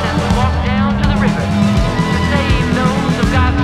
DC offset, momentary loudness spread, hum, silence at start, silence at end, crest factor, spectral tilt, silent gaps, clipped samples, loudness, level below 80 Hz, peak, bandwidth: under 0.1%; 2 LU; none; 0 s; 0 s; 12 dB; -6.5 dB/octave; none; under 0.1%; -14 LUFS; -22 dBFS; 0 dBFS; 13 kHz